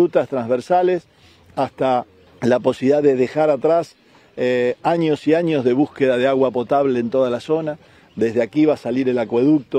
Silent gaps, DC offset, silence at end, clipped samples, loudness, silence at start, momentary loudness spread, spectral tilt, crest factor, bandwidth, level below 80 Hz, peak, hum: none; under 0.1%; 0 s; under 0.1%; -19 LUFS; 0 s; 8 LU; -7.5 dB/octave; 14 dB; 9.6 kHz; -62 dBFS; -4 dBFS; none